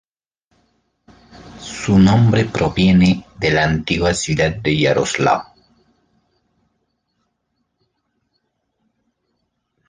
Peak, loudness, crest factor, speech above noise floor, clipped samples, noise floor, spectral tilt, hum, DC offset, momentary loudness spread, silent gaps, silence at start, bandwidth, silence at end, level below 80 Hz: -2 dBFS; -16 LUFS; 18 dB; 56 dB; under 0.1%; -71 dBFS; -5.5 dB/octave; none; under 0.1%; 7 LU; none; 1.45 s; 9.8 kHz; 4.45 s; -40 dBFS